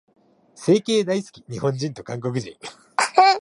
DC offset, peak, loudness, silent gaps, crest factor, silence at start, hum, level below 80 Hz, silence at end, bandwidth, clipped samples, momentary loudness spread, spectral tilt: under 0.1%; -2 dBFS; -22 LUFS; none; 20 dB; 0.6 s; none; -66 dBFS; 0 s; 11.5 kHz; under 0.1%; 15 LU; -4.5 dB/octave